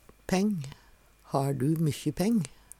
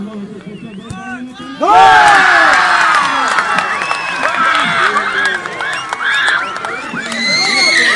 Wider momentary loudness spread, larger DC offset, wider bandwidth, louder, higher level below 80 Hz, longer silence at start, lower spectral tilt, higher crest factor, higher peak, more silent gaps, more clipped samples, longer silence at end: second, 6 LU vs 20 LU; neither; first, 16.5 kHz vs 11.5 kHz; second, -29 LUFS vs -11 LUFS; second, -56 dBFS vs -50 dBFS; first, 0.3 s vs 0 s; first, -6.5 dB/octave vs -1.5 dB/octave; about the same, 16 dB vs 12 dB; second, -14 dBFS vs 0 dBFS; neither; neither; first, 0.3 s vs 0 s